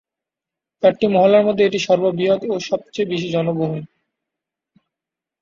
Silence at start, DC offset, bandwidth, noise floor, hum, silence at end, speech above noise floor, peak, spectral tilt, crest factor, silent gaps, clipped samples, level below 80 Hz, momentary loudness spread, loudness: 0.8 s; under 0.1%; 7.6 kHz; -86 dBFS; none; 1.55 s; 69 dB; -2 dBFS; -6 dB/octave; 18 dB; none; under 0.1%; -62 dBFS; 9 LU; -18 LUFS